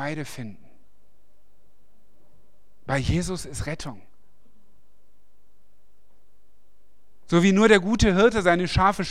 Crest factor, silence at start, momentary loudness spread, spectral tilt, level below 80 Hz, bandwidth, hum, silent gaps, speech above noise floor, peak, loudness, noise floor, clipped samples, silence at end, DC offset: 22 dB; 0 s; 20 LU; -5.5 dB/octave; -40 dBFS; 13.5 kHz; none; none; 46 dB; -4 dBFS; -21 LUFS; -67 dBFS; under 0.1%; 0 s; 1%